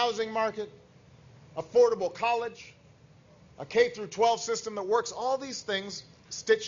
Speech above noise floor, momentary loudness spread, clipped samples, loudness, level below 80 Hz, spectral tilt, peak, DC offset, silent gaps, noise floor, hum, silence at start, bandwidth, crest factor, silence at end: 28 dB; 17 LU; under 0.1%; -29 LUFS; -70 dBFS; -2.5 dB/octave; -10 dBFS; under 0.1%; none; -57 dBFS; none; 0 s; 7.6 kHz; 20 dB; 0 s